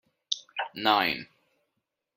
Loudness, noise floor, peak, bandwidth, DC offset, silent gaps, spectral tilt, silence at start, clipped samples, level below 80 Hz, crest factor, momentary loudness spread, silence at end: -28 LUFS; -82 dBFS; -6 dBFS; 16.5 kHz; under 0.1%; none; -2.5 dB/octave; 0.3 s; under 0.1%; -74 dBFS; 26 dB; 12 LU; 0.9 s